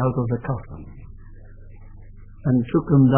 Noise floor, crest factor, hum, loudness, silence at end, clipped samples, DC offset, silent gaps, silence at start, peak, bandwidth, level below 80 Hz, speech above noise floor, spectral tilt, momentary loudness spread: -41 dBFS; 20 dB; none; -22 LUFS; 0 s; under 0.1%; under 0.1%; none; 0 s; -2 dBFS; 3.4 kHz; -42 dBFS; 21 dB; -13.5 dB/octave; 24 LU